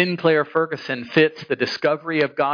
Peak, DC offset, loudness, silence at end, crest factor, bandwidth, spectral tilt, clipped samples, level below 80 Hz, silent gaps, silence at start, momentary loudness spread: -4 dBFS; under 0.1%; -21 LUFS; 0 s; 16 dB; 5.4 kHz; -6.5 dB/octave; under 0.1%; -70 dBFS; none; 0 s; 6 LU